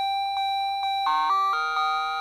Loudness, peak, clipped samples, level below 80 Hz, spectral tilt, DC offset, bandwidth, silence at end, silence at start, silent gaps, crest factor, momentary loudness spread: -24 LUFS; -14 dBFS; under 0.1%; -64 dBFS; 0.5 dB/octave; under 0.1%; 14 kHz; 0 s; 0 s; none; 12 dB; 4 LU